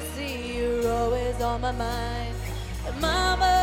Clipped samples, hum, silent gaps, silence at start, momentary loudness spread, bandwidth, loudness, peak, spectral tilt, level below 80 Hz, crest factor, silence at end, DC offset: under 0.1%; none; none; 0 s; 10 LU; 16.5 kHz; -27 LUFS; -10 dBFS; -4.5 dB/octave; -34 dBFS; 16 dB; 0 s; under 0.1%